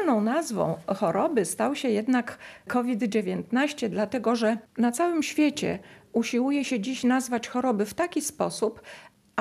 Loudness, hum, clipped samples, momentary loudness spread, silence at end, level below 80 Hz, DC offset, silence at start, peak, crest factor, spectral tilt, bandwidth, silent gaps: -27 LUFS; none; under 0.1%; 6 LU; 0 s; -66 dBFS; under 0.1%; 0 s; -8 dBFS; 18 dB; -4.5 dB/octave; 14.5 kHz; none